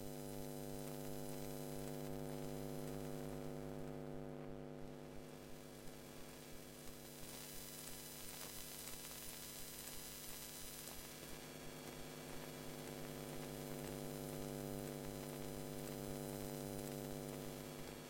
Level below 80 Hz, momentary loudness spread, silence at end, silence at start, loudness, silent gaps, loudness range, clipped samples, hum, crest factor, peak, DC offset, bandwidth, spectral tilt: -62 dBFS; 7 LU; 0 s; 0 s; -50 LUFS; none; 5 LU; under 0.1%; none; 18 dB; -30 dBFS; under 0.1%; 16.5 kHz; -4.5 dB/octave